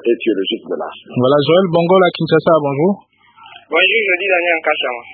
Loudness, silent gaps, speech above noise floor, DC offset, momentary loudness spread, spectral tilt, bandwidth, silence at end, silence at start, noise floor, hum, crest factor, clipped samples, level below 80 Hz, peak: -14 LUFS; none; 27 dB; under 0.1%; 10 LU; -9.5 dB/octave; 4.8 kHz; 0 s; 0.05 s; -42 dBFS; none; 14 dB; under 0.1%; -62 dBFS; 0 dBFS